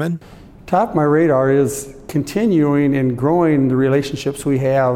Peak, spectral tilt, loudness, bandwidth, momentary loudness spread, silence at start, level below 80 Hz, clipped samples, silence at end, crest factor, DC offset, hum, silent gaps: -2 dBFS; -7 dB/octave; -16 LUFS; 16 kHz; 9 LU; 0 s; -46 dBFS; under 0.1%; 0 s; 14 dB; under 0.1%; none; none